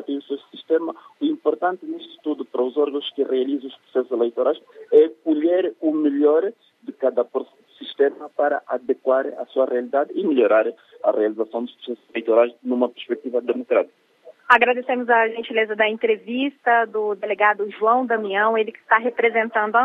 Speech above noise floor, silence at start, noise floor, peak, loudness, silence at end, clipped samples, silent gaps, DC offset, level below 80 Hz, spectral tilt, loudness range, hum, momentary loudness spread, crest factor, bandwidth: 19 dB; 0 s; -40 dBFS; 0 dBFS; -21 LUFS; 0 s; under 0.1%; none; under 0.1%; -82 dBFS; -6 dB/octave; 4 LU; none; 11 LU; 20 dB; 4.5 kHz